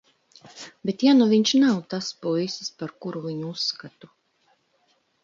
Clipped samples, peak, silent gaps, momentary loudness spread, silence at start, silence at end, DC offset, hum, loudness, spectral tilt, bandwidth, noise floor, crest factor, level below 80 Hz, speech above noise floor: under 0.1%; -8 dBFS; none; 16 LU; 0.45 s; 1.35 s; under 0.1%; none; -23 LUFS; -5 dB/octave; 7.6 kHz; -67 dBFS; 16 dB; -74 dBFS; 44 dB